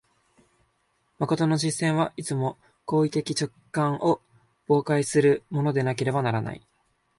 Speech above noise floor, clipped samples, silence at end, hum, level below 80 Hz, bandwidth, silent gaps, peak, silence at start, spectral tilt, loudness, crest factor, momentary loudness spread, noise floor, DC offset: 46 dB; under 0.1%; 0.6 s; none; -64 dBFS; 11.5 kHz; none; -10 dBFS; 1.2 s; -6 dB/octave; -25 LUFS; 16 dB; 9 LU; -70 dBFS; under 0.1%